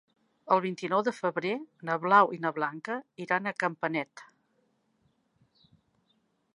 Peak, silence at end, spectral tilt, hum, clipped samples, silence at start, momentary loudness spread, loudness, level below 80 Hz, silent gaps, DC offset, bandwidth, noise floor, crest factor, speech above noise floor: -8 dBFS; 2.3 s; -6 dB/octave; none; under 0.1%; 0.45 s; 14 LU; -29 LUFS; -84 dBFS; none; under 0.1%; 11 kHz; -73 dBFS; 24 dB; 44 dB